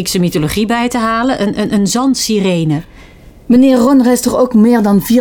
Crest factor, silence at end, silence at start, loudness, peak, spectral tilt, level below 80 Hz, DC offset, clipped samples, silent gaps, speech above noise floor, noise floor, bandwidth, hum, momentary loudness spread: 10 dB; 0 s; 0 s; -11 LUFS; -2 dBFS; -5.5 dB/octave; -38 dBFS; under 0.1%; under 0.1%; none; 26 dB; -37 dBFS; over 20 kHz; none; 6 LU